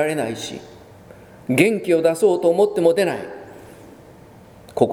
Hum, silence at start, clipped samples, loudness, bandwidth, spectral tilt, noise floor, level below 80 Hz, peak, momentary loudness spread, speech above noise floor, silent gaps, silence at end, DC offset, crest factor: none; 0 s; under 0.1%; -19 LUFS; 18.5 kHz; -5.5 dB/octave; -45 dBFS; -58 dBFS; 0 dBFS; 19 LU; 26 dB; none; 0 s; under 0.1%; 20 dB